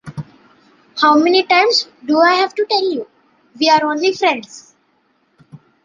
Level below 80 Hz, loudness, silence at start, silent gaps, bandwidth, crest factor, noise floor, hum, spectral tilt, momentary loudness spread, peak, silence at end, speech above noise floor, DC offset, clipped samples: -64 dBFS; -14 LUFS; 0.05 s; none; 9.6 kHz; 16 dB; -61 dBFS; none; -3.5 dB/octave; 15 LU; 0 dBFS; 0.3 s; 46 dB; under 0.1%; under 0.1%